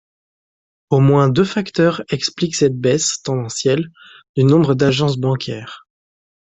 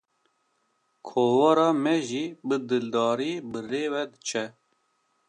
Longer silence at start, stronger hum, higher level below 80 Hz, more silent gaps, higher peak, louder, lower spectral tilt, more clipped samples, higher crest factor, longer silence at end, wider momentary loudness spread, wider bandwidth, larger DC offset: second, 0.9 s vs 1.05 s; neither; first, -52 dBFS vs -76 dBFS; first, 4.29-4.34 s vs none; first, -2 dBFS vs -8 dBFS; first, -17 LUFS vs -26 LUFS; about the same, -5.5 dB/octave vs -5 dB/octave; neither; about the same, 16 dB vs 20 dB; about the same, 0.8 s vs 0.8 s; about the same, 10 LU vs 12 LU; second, 8.4 kHz vs 10.5 kHz; neither